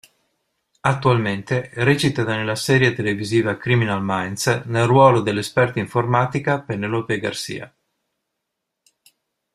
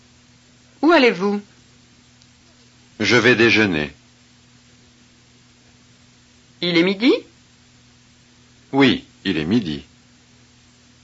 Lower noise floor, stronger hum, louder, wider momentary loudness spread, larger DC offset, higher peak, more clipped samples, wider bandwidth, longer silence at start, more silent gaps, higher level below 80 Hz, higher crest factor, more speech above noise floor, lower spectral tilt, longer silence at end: first, -79 dBFS vs -52 dBFS; neither; about the same, -19 LUFS vs -17 LUFS; second, 8 LU vs 12 LU; neither; about the same, -2 dBFS vs -2 dBFS; neither; first, 14.5 kHz vs 8 kHz; about the same, 0.85 s vs 0.8 s; neither; about the same, -54 dBFS vs -56 dBFS; about the same, 20 dB vs 18 dB; first, 60 dB vs 35 dB; about the same, -5.5 dB/octave vs -5 dB/octave; first, 1.85 s vs 1.2 s